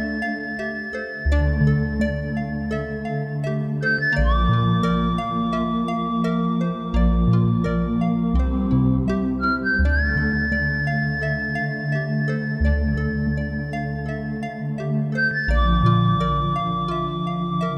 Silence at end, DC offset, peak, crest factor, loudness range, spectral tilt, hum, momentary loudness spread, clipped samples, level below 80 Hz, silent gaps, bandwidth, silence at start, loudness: 0 s; under 0.1%; -6 dBFS; 16 dB; 3 LU; -8 dB/octave; none; 8 LU; under 0.1%; -28 dBFS; none; 8.4 kHz; 0 s; -22 LUFS